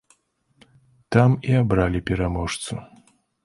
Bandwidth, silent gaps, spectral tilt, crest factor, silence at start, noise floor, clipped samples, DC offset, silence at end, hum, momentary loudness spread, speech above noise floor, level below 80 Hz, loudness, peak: 11.5 kHz; none; -6.5 dB/octave; 20 dB; 1.1 s; -65 dBFS; under 0.1%; under 0.1%; 0.6 s; none; 12 LU; 44 dB; -38 dBFS; -22 LUFS; -2 dBFS